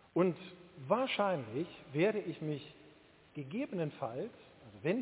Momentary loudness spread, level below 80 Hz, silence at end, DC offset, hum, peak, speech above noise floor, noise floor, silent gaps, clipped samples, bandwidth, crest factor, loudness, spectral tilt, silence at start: 18 LU; -76 dBFS; 0 s; under 0.1%; none; -18 dBFS; 26 dB; -62 dBFS; none; under 0.1%; 4 kHz; 20 dB; -37 LUFS; -5 dB/octave; 0.15 s